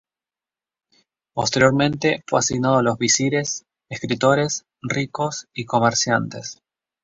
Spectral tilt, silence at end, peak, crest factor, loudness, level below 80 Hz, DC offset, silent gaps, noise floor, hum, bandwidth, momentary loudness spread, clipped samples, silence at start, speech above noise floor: -4 dB/octave; 0.5 s; -2 dBFS; 20 dB; -20 LUFS; -56 dBFS; under 0.1%; none; under -90 dBFS; none; 7.8 kHz; 14 LU; under 0.1%; 1.35 s; over 70 dB